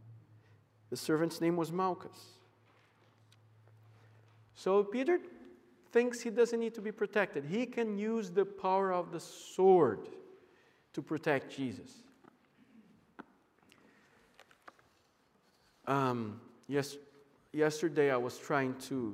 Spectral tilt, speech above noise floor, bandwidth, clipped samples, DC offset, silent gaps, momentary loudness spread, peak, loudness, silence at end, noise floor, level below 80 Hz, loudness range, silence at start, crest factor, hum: -6 dB/octave; 38 dB; 16 kHz; under 0.1%; under 0.1%; none; 15 LU; -16 dBFS; -34 LUFS; 0 s; -71 dBFS; -82 dBFS; 9 LU; 0.05 s; 20 dB; none